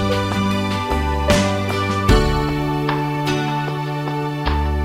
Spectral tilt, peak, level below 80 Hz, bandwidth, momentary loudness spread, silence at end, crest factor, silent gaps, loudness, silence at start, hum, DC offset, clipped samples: -5.5 dB/octave; -2 dBFS; -26 dBFS; 16 kHz; 6 LU; 0 s; 18 dB; none; -19 LUFS; 0 s; none; under 0.1%; under 0.1%